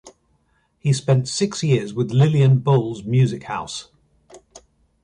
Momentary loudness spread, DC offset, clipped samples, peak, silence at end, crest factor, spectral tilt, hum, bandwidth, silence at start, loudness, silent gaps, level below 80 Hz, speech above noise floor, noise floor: 12 LU; under 0.1%; under 0.1%; -4 dBFS; 0.45 s; 16 dB; -6.5 dB/octave; none; 10.5 kHz; 0.05 s; -19 LUFS; none; -56 dBFS; 46 dB; -64 dBFS